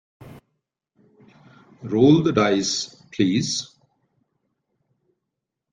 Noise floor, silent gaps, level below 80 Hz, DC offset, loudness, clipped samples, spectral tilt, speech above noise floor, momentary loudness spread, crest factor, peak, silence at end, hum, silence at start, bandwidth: -82 dBFS; none; -60 dBFS; under 0.1%; -20 LUFS; under 0.1%; -5 dB/octave; 63 dB; 16 LU; 20 dB; -4 dBFS; 2.05 s; none; 0.2 s; 9.6 kHz